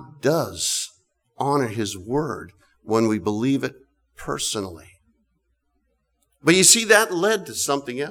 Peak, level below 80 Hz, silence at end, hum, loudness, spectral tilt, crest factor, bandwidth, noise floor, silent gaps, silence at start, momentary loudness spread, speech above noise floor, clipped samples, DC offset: -2 dBFS; -56 dBFS; 0 s; none; -20 LUFS; -2.5 dB/octave; 20 dB; over 20 kHz; -70 dBFS; none; 0 s; 17 LU; 49 dB; under 0.1%; under 0.1%